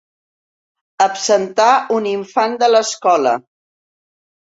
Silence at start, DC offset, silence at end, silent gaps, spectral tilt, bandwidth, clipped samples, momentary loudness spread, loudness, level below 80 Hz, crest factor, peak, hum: 1 s; under 0.1%; 1.1 s; none; -2.5 dB/octave; 8 kHz; under 0.1%; 6 LU; -15 LUFS; -68 dBFS; 16 dB; -2 dBFS; none